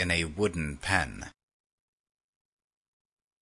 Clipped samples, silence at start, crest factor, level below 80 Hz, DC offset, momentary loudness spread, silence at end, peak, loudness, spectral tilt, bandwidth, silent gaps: under 0.1%; 0 s; 26 dB; -52 dBFS; under 0.1%; 15 LU; 2.1 s; -8 dBFS; -30 LUFS; -4.5 dB/octave; 11 kHz; none